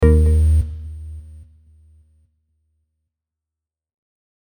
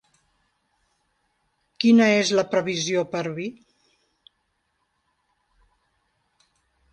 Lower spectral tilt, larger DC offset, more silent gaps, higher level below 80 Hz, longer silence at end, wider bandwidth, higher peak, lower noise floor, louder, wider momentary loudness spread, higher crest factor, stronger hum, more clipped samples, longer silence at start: first, -9 dB/octave vs -4.5 dB/octave; neither; neither; first, -24 dBFS vs -70 dBFS; about the same, 3.3 s vs 3.4 s; first, 18 kHz vs 9 kHz; first, -2 dBFS vs -6 dBFS; first, -87 dBFS vs -73 dBFS; first, -17 LUFS vs -21 LUFS; first, 22 LU vs 14 LU; about the same, 20 dB vs 20 dB; neither; neither; second, 0 s vs 1.8 s